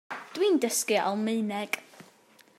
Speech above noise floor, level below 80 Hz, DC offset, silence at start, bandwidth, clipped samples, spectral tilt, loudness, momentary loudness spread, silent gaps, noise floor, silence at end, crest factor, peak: 31 dB; -86 dBFS; under 0.1%; 0.1 s; 16 kHz; under 0.1%; -3 dB/octave; -28 LUFS; 9 LU; none; -59 dBFS; 0.55 s; 18 dB; -10 dBFS